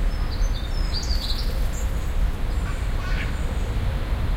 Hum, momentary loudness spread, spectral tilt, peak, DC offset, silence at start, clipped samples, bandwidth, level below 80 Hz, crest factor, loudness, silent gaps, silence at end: none; 2 LU; -5 dB/octave; -10 dBFS; under 0.1%; 0 s; under 0.1%; 16 kHz; -24 dBFS; 12 dB; -28 LUFS; none; 0 s